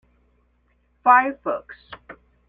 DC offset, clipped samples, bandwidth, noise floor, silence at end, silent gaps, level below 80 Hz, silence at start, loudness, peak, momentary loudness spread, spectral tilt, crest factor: under 0.1%; under 0.1%; 4.9 kHz; -64 dBFS; 0.35 s; none; -62 dBFS; 1.05 s; -20 LUFS; -2 dBFS; 26 LU; -6.5 dB/octave; 22 dB